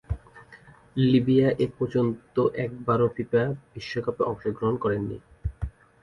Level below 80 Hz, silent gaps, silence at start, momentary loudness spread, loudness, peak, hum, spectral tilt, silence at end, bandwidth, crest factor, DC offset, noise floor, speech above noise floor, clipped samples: -44 dBFS; none; 0.1 s; 14 LU; -26 LUFS; -10 dBFS; none; -9 dB/octave; 0.35 s; 10 kHz; 16 dB; under 0.1%; -51 dBFS; 27 dB; under 0.1%